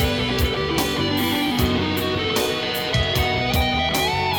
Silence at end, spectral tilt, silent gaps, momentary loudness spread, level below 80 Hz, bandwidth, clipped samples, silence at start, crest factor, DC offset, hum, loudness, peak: 0 s; -4.5 dB/octave; none; 2 LU; -32 dBFS; over 20 kHz; under 0.1%; 0 s; 16 dB; under 0.1%; none; -21 LUFS; -6 dBFS